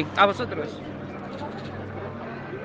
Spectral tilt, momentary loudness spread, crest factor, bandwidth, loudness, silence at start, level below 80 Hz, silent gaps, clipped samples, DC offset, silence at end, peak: -6 dB/octave; 15 LU; 26 dB; 9 kHz; -29 LUFS; 0 s; -56 dBFS; none; under 0.1%; under 0.1%; 0 s; -2 dBFS